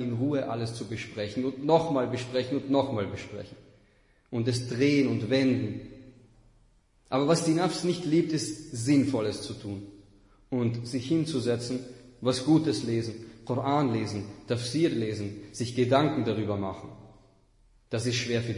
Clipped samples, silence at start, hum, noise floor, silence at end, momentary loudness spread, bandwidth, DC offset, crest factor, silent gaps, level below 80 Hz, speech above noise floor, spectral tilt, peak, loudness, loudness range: under 0.1%; 0 s; none; -63 dBFS; 0 s; 13 LU; 11 kHz; under 0.1%; 20 dB; none; -62 dBFS; 35 dB; -6 dB/octave; -8 dBFS; -28 LUFS; 2 LU